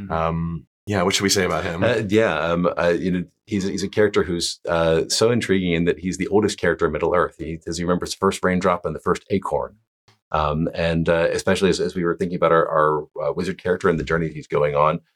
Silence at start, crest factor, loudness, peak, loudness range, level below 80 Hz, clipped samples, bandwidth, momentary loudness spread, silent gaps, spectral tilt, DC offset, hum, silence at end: 0 s; 16 dB; -21 LUFS; -4 dBFS; 2 LU; -44 dBFS; under 0.1%; 16 kHz; 7 LU; 0.67-0.87 s, 9.87-10.08 s, 10.22-10.31 s; -5 dB/octave; under 0.1%; none; 0.15 s